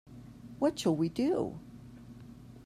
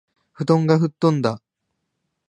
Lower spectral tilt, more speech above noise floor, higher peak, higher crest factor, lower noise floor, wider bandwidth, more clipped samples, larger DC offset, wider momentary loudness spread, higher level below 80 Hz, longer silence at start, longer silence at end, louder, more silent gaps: second, -6.5 dB/octave vs -8 dB/octave; second, 20 dB vs 59 dB; second, -18 dBFS vs -2 dBFS; about the same, 16 dB vs 20 dB; second, -51 dBFS vs -77 dBFS; first, 14.5 kHz vs 10 kHz; neither; neither; first, 21 LU vs 11 LU; about the same, -62 dBFS vs -64 dBFS; second, 0.1 s vs 0.4 s; second, 0 s vs 0.9 s; second, -32 LUFS vs -20 LUFS; neither